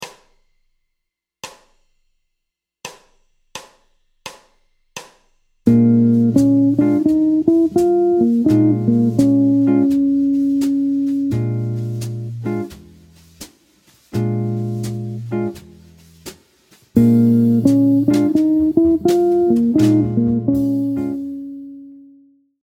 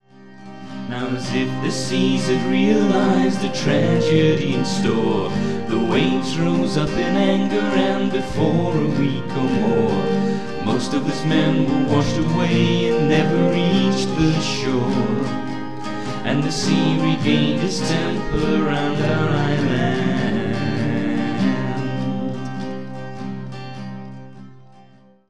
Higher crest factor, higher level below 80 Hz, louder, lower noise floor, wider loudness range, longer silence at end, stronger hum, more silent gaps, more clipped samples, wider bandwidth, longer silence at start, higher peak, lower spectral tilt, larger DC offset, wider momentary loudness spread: about the same, 16 dB vs 16 dB; second, -50 dBFS vs -44 dBFS; first, -16 LUFS vs -20 LUFS; first, -78 dBFS vs -50 dBFS; first, 11 LU vs 5 LU; first, 0.65 s vs 0 s; neither; neither; neither; first, 15.5 kHz vs 11 kHz; about the same, 0 s vs 0 s; first, 0 dBFS vs -4 dBFS; first, -8.5 dB/octave vs -6 dB/octave; second, under 0.1% vs 3%; first, 22 LU vs 11 LU